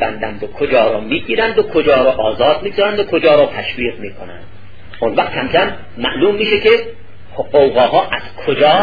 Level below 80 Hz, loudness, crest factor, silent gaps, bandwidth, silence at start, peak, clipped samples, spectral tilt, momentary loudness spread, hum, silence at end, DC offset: -42 dBFS; -14 LUFS; 14 dB; none; 5 kHz; 0 s; 0 dBFS; under 0.1%; -7 dB/octave; 12 LU; none; 0 s; 3%